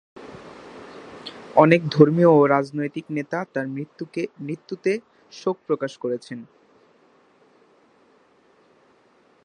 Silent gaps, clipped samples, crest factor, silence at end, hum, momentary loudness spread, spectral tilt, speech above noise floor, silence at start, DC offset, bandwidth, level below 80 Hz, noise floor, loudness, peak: none; under 0.1%; 24 dB; 3 s; none; 26 LU; -7.5 dB/octave; 38 dB; 0.2 s; under 0.1%; 9.6 kHz; -68 dBFS; -59 dBFS; -21 LUFS; 0 dBFS